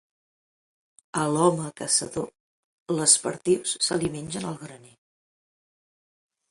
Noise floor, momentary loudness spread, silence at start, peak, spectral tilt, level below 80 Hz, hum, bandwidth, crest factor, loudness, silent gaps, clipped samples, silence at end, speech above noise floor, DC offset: under -90 dBFS; 16 LU; 1.15 s; -4 dBFS; -3 dB/octave; -64 dBFS; none; 11.5 kHz; 24 dB; -24 LUFS; 2.40-2.86 s; under 0.1%; 1.75 s; over 65 dB; under 0.1%